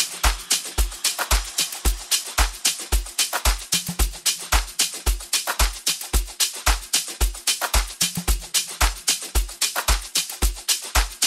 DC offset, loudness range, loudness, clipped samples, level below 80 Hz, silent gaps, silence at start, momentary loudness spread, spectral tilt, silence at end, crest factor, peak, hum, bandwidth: under 0.1%; 0 LU; -22 LUFS; under 0.1%; -26 dBFS; none; 0 s; 4 LU; -1 dB/octave; 0 s; 18 dB; -4 dBFS; none; 16 kHz